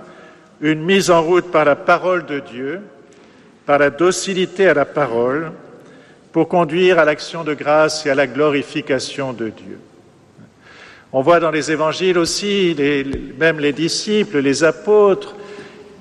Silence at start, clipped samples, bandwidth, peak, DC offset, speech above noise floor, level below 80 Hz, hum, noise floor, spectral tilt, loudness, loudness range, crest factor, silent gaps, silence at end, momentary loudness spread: 0 s; under 0.1%; 13 kHz; -2 dBFS; under 0.1%; 31 dB; -50 dBFS; none; -47 dBFS; -4.5 dB/octave; -16 LUFS; 4 LU; 14 dB; none; 0.15 s; 13 LU